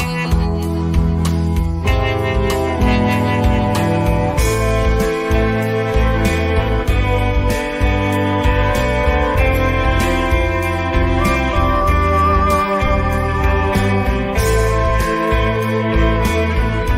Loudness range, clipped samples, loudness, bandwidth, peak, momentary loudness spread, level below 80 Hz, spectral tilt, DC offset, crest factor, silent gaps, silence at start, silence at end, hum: 1 LU; under 0.1%; -16 LUFS; 16 kHz; -2 dBFS; 3 LU; -20 dBFS; -6.5 dB/octave; under 0.1%; 12 dB; none; 0 s; 0 s; none